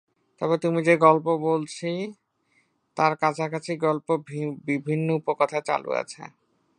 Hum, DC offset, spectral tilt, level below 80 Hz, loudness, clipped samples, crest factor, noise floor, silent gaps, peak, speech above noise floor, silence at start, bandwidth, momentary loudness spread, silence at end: none; under 0.1%; -6.5 dB/octave; -76 dBFS; -24 LUFS; under 0.1%; 22 dB; -68 dBFS; none; -2 dBFS; 44 dB; 0.4 s; 10.5 kHz; 13 LU; 0.5 s